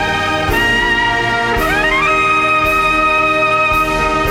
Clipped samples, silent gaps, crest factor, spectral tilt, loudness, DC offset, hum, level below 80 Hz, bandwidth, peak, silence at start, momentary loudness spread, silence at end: under 0.1%; none; 12 dB; -4 dB/octave; -12 LUFS; under 0.1%; none; -30 dBFS; over 20 kHz; -2 dBFS; 0 s; 3 LU; 0 s